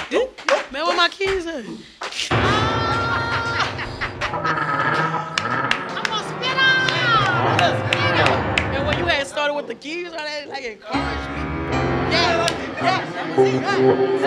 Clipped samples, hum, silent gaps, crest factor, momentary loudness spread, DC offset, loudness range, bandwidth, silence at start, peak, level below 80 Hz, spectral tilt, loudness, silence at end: under 0.1%; none; none; 18 dB; 11 LU; under 0.1%; 5 LU; 12.5 kHz; 0 s; -2 dBFS; -40 dBFS; -4.5 dB/octave; -20 LUFS; 0 s